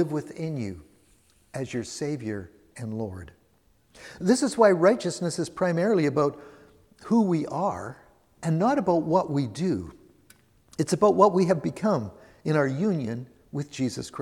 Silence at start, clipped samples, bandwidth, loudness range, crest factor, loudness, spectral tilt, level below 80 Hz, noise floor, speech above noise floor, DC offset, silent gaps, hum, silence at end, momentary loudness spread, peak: 0 s; under 0.1%; 14 kHz; 10 LU; 22 dB; -25 LUFS; -6.5 dB/octave; -60 dBFS; -64 dBFS; 39 dB; under 0.1%; none; none; 0 s; 18 LU; -4 dBFS